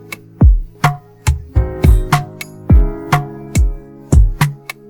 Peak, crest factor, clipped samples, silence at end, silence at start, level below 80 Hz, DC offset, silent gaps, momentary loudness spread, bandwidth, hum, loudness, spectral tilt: 0 dBFS; 14 dB; under 0.1%; 0.35 s; 0.1 s; -16 dBFS; under 0.1%; none; 8 LU; 18 kHz; none; -15 LUFS; -6.5 dB/octave